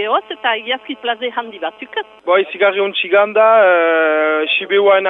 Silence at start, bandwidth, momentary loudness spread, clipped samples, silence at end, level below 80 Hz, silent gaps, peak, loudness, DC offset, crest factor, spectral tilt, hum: 0 s; 4 kHz; 13 LU; under 0.1%; 0 s; -70 dBFS; none; -2 dBFS; -15 LUFS; under 0.1%; 12 dB; -6 dB/octave; none